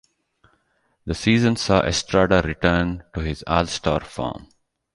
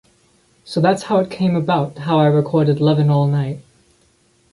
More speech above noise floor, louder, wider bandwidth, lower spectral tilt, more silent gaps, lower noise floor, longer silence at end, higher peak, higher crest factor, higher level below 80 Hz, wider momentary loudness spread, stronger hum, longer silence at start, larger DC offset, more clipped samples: first, 46 dB vs 42 dB; second, -21 LUFS vs -17 LUFS; about the same, 11.5 kHz vs 11.5 kHz; second, -5 dB/octave vs -8 dB/octave; neither; first, -67 dBFS vs -58 dBFS; second, 0.5 s vs 0.95 s; about the same, -2 dBFS vs -2 dBFS; about the same, 20 dB vs 16 dB; first, -38 dBFS vs -56 dBFS; first, 12 LU vs 7 LU; neither; first, 1.05 s vs 0.65 s; neither; neither